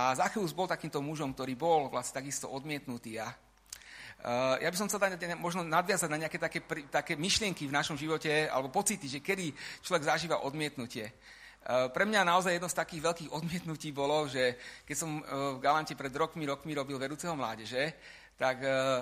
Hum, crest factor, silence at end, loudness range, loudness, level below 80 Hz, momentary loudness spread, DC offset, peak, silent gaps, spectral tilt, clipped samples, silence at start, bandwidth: none; 20 dB; 0 s; 3 LU; -33 LUFS; -64 dBFS; 11 LU; under 0.1%; -12 dBFS; none; -3.5 dB/octave; under 0.1%; 0 s; 15.5 kHz